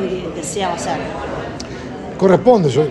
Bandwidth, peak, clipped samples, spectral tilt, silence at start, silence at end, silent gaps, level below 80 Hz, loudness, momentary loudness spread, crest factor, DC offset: 12 kHz; 0 dBFS; under 0.1%; -6 dB/octave; 0 s; 0 s; none; -42 dBFS; -17 LUFS; 16 LU; 16 dB; under 0.1%